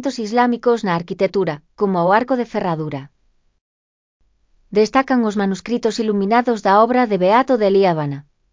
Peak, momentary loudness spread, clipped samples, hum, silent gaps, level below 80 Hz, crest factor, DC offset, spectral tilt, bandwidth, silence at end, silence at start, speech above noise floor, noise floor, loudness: -2 dBFS; 8 LU; under 0.1%; none; 3.61-4.20 s; -58 dBFS; 16 dB; under 0.1%; -6.5 dB/octave; 7.6 kHz; 0.3 s; 0 s; 41 dB; -58 dBFS; -17 LUFS